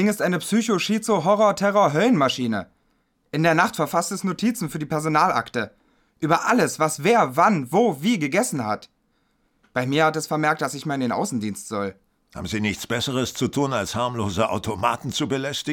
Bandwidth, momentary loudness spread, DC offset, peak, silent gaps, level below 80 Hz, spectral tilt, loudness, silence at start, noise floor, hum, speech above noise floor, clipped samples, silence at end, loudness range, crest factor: 18.5 kHz; 10 LU; under 0.1%; -4 dBFS; none; -58 dBFS; -4.5 dB/octave; -22 LUFS; 0 s; -67 dBFS; none; 45 dB; under 0.1%; 0 s; 5 LU; 20 dB